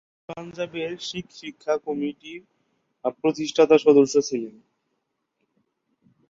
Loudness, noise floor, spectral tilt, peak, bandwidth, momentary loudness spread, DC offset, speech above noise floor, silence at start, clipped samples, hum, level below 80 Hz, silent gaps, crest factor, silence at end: -22 LUFS; -77 dBFS; -4.5 dB/octave; -4 dBFS; 7.6 kHz; 22 LU; under 0.1%; 54 dB; 0.3 s; under 0.1%; none; -68 dBFS; none; 20 dB; 1.8 s